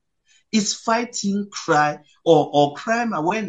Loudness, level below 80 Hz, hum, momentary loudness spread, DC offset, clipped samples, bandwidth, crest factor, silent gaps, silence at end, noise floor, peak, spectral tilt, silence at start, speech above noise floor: -20 LUFS; -68 dBFS; none; 7 LU; under 0.1%; under 0.1%; 9.2 kHz; 20 dB; none; 0 s; -62 dBFS; -2 dBFS; -4 dB/octave; 0.55 s; 42 dB